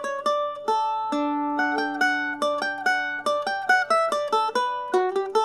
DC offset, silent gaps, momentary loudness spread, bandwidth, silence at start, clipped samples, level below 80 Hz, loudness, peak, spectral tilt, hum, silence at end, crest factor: under 0.1%; none; 4 LU; 13.5 kHz; 0 s; under 0.1%; -74 dBFS; -24 LUFS; -8 dBFS; -2.5 dB/octave; none; 0 s; 16 dB